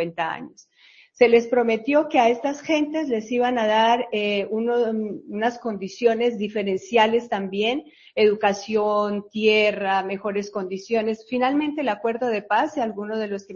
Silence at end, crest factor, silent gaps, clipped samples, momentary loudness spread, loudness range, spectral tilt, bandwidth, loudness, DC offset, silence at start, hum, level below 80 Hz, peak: 0 s; 18 dB; none; under 0.1%; 10 LU; 3 LU; -5 dB/octave; 7.2 kHz; -22 LUFS; under 0.1%; 0 s; none; -66 dBFS; -4 dBFS